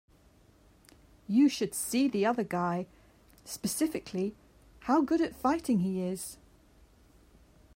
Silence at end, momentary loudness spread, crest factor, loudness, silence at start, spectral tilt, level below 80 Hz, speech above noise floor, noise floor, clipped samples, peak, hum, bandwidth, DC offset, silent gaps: 1.4 s; 14 LU; 16 dB; -30 LUFS; 1.3 s; -5 dB/octave; -62 dBFS; 32 dB; -61 dBFS; under 0.1%; -16 dBFS; none; 16 kHz; under 0.1%; none